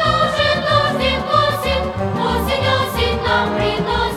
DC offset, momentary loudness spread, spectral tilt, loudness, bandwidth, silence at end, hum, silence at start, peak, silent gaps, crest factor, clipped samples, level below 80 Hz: under 0.1%; 4 LU; -5 dB/octave; -17 LUFS; 17.5 kHz; 0 s; none; 0 s; -2 dBFS; none; 14 dB; under 0.1%; -32 dBFS